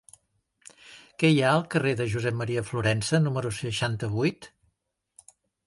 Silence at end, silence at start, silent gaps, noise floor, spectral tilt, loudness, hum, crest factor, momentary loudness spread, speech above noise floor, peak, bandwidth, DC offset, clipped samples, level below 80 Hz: 1.2 s; 0.85 s; none; -77 dBFS; -5.5 dB/octave; -26 LUFS; none; 20 dB; 8 LU; 52 dB; -8 dBFS; 11.5 kHz; under 0.1%; under 0.1%; -56 dBFS